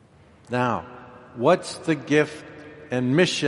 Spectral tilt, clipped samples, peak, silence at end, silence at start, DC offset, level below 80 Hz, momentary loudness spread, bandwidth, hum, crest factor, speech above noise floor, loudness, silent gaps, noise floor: -5 dB/octave; under 0.1%; -4 dBFS; 0 s; 0.5 s; under 0.1%; -62 dBFS; 21 LU; 11.5 kHz; none; 20 dB; 30 dB; -23 LUFS; none; -52 dBFS